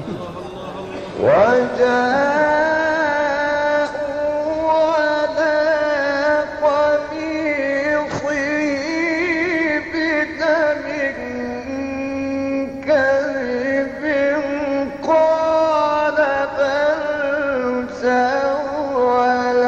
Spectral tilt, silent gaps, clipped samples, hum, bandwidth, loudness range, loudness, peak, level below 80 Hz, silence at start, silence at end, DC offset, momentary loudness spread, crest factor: -5 dB/octave; none; under 0.1%; none; 8.2 kHz; 3 LU; -18 LUFS; -2 dBFS; -50 dBFS; 0 s; 0 s; under 0.1%; 7 LU; 16 dB